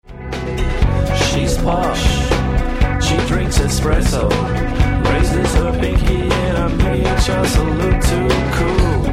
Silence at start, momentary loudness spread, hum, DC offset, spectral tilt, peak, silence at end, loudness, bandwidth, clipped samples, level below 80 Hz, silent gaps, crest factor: 0.1 s; 2 LU; none; under 0.1%; -5.5 dB/octave; -2 dBFS; 0 s; -17 LUFS; 15 kHz; under 0.1%; -18 dBFS; none; 12 dB